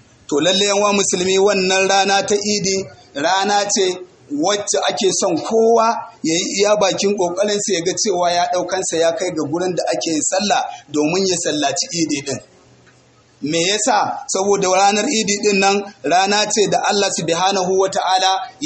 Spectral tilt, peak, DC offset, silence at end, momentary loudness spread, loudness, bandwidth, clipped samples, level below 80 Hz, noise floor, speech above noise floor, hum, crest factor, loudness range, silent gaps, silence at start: -2.5 dB/octave; -2 dBFS; under 0.1%; 0 s; 7 LU; -16 LUFS; 8.8 kHz; under 0.1%; -60 dBFS; -51 dBFS; 34 dB; none; 16 dB; 4 LU; none; 0.3 s